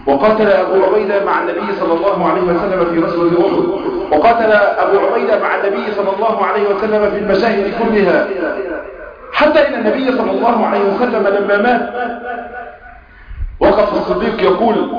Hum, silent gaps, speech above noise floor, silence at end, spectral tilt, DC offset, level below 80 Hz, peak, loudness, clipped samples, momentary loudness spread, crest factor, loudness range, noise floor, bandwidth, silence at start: none; none; 24 dB; 0 s; -7.5 dB/octave; under 0.1%; -38 dBFS; -2 dBFS; -14 LUFS; under 0.1%; 10 LU; 10 dB; 3 LU; -37 dBFS; 5.2 kHz; 0 s